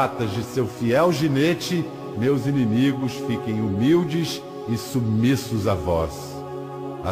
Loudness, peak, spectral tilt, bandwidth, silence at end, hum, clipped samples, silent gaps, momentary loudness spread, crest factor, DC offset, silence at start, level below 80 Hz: -23 LUFS; -8 dBFS; -6.5 dB/octave; 15.5 kHz; 0 s; none; under 0.1%; none; 11 LU; 14 dB; under 0.1%; 0 s; -46 dBFS